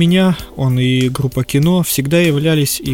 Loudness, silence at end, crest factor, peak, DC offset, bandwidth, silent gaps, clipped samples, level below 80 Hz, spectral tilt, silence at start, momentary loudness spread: -14 LUFS; 0 s; 12 dB; 0 dBFS; 0.3%; 18.5 kHz; none; under 0.1%; -40 dBFS; -5.5 dB/octave; 0 s; 4 LU